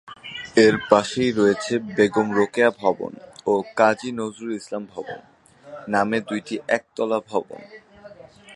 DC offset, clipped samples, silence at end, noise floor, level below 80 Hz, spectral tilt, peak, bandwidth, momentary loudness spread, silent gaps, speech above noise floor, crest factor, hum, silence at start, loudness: under 0.1%; under 0.1%; 0 s; -45 dBFS; -60 dBFS; -5 dB/octave; 0 dBFS; 11.5 kHz; 17 LU; none; 24 dB; 22 dB; none; 0.05 s; -22 LUFS